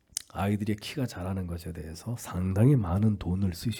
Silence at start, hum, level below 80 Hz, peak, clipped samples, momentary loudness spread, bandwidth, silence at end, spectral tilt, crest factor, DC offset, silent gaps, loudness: 0.35 s; none; -52 dBFS; -10 dBFS; under 0.1%; 14 LU; 18 kHz; 0 s; -6.5 dB/octave; 18 dB; under 0.1%; none; -29 LUFS